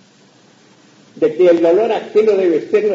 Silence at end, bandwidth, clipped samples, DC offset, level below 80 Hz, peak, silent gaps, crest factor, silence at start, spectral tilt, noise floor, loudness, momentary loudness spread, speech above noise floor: 0 s; 7.6 kHz; under 0.1%; under 0.1%; -68 dBFS; -2 dBFS; none; 14 dB; 1.15 s; -6.5 dB/octave; -49 dBFS; -14 LUFS; 5 LU; 36 dB